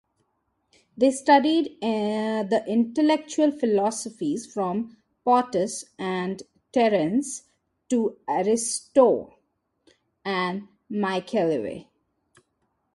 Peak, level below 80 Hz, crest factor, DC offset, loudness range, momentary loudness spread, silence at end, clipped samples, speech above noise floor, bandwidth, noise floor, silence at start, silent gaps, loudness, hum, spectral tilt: -6 dBFS; -68 dBFS; 20 dB; under 0.1%; 4 LU; 12 LU; 1.15 s; under 0.1%; 50 dB; 11.5 kHz; -74 dBFS; 0.95 s; none; -24 LUFS; none; -4.5 dB/octave